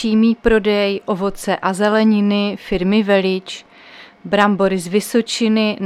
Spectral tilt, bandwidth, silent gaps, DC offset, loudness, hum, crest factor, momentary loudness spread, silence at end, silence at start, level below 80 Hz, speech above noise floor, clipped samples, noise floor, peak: -5.5 dB/octave; 14 kHz; none; under 0.1%; -16 LUFS; none; 16 dB; 7 LU; 0 s; 0 s; -40 dBFS; 26 dB; under 0.1%; -42 dBFS; 0 dBFS